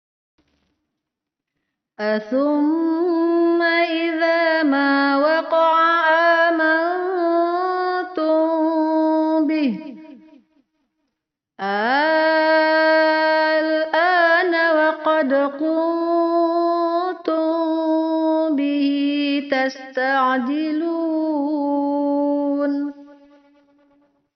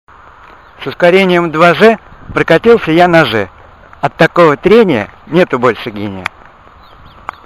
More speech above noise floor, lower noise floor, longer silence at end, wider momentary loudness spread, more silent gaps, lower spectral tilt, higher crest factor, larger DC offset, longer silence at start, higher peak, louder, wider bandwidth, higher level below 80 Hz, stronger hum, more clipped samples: first, 63 dB vs 30 dB; first, -83 dBFS vs -39 dBFS; about the same, 1.25 s vs 1.2 s; second, 7 LU vs 16 LU; neither; second, -1 dB/octave vs -6.5 dB/octave; about the same, 14 dB vs 10 dB; second, under 0.1% vs 0.2%; first, 2 s vs 0.8 s; second, -6 dBFS vs 0 dBFS; second, -18 LUFS vs -10 LUFS; second, 6.2 kHz vs 13.5 kHz; second, -74 dBFS vs -42 dBFS; neither; second, under 0.1% vs 1%